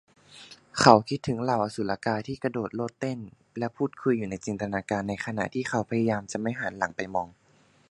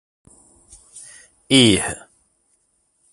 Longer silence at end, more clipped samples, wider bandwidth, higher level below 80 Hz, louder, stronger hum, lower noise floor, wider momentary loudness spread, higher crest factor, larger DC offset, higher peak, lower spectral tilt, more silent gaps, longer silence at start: second, 0.6 s vs 1.15 s; neither; about the same, 11.5 kHz vs 11.5 kHz; second, -60 dBFS vs -50 dBFS; second, -28 LUFS vs -16 LUFS; neither; second, -51 dBFS vs -66 dBFS; second, 13 LU vs 27 LU; first, 28 dB vs 22 dB; neither; about the same, 0 dBFS vs 0 dBFS; first, -5.5 dB/octave vs -3.5 dB/octave; neither; second, 0.3 s vs 0.95 s